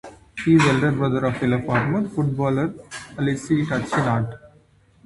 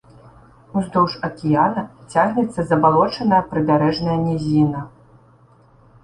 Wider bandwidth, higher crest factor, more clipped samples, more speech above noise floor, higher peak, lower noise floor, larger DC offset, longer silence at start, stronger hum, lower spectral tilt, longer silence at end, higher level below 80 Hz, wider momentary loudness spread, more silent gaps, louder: about the same, 11.5 kHz vs 11 kHz; about the same, 18 dB vs 18 dB; neither; about the same, 35 dB vs 33 dB; about the same, -4 dBFS vs -2 dBFS; first, -55 dBFS vs -51 dBFS; neither; second, 0.05 s vs 0.75 s; neither; about the same, -7 dB/octave vs -7.5 dB/octave; second, 0.6 s vs 1.15 s; about the same, -50 dBFS vs -50 dBFS; about the same, 11 LU vs 9 LU; neither; about the same, -21 LUFS vs -19 LUFS